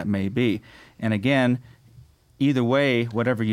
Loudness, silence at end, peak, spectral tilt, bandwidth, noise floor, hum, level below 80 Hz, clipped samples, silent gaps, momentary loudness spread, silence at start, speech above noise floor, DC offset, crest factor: -23 LUFS; 0 s; -8 dBFS; -7.5 dB/octave; 14 kHz; -52 dBFS; none; -60 dBFS; under 0.1%; none; 8 LU; 0 s; 29 dB; under 0.1%; 14 dB